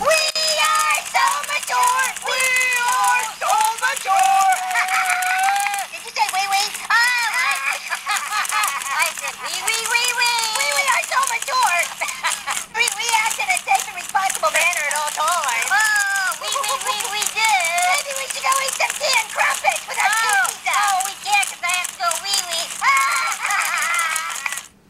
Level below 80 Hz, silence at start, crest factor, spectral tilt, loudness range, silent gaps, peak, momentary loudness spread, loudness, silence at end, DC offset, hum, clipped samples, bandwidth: -64 dBFS; 0 s; 20 dB; 2.5 dB/octave; 2 LU; none; 0 dBFS; 6 LU; -18 LUFS; 0.2 s; under 0.1%; none; under 0.1%; 16.5 kHz